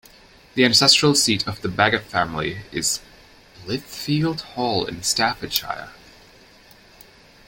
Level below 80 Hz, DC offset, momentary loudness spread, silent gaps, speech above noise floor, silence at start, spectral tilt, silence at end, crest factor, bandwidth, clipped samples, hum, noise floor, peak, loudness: -52 dBFS; under 0.1%; 16 LU; none; 29 dB; 0.55 s; -3 dB/octave; 1.55 s; 22 dB; 17 kHz; under 0.1%; none; -50 dBFS; -2 dBFS; -20 LUFS